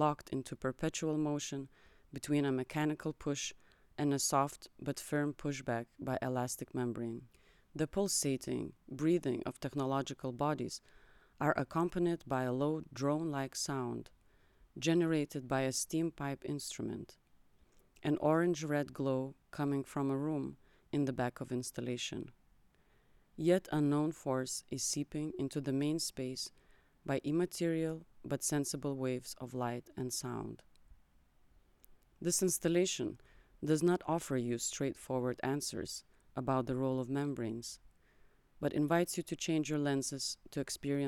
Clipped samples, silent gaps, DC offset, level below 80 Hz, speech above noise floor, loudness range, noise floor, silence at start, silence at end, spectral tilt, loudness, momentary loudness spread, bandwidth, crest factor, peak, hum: under 0.1%; none; under 0.1%; -66 dBFS; 33 dB; 3 LU; -69 dBFS; 0 s; 0 s; -5 dB/octave; -37 LUFS; 11 LU; 17.5 kHz; 20 dB; -18 dBFS; none